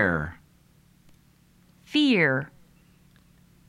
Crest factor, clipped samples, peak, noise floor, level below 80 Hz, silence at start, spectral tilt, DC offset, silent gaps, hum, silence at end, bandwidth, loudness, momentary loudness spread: 20 dB; under 0.1%; -8 dBFS; -59 dBFS; -54 dBFS; 0 s; -6 dB/octave; under 0.1%; none; none; 1.2 s; 12 kHz; -24 LUFS; 17 LU